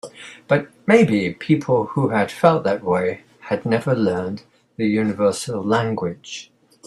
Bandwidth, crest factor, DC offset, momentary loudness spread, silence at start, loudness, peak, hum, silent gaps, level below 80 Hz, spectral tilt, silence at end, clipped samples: 12.5 kHz; 20 dB; under 0.1%; 16 LU; 0.05 s; -20 LUFS; 0 dBFS; none; none; -60 dBFS; -6.5 dB/octave; 0.45 s; under 0.1%